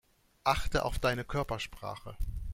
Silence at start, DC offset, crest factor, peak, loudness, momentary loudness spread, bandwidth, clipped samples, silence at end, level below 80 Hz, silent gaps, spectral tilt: 0.45 s; under 0.1%; 20 dB; -12 dBFS; -34 LUFS; 12 LU; 16.5 kHz; under 0.1%; 0 s; -40 dBFS; none; -5 dB/octave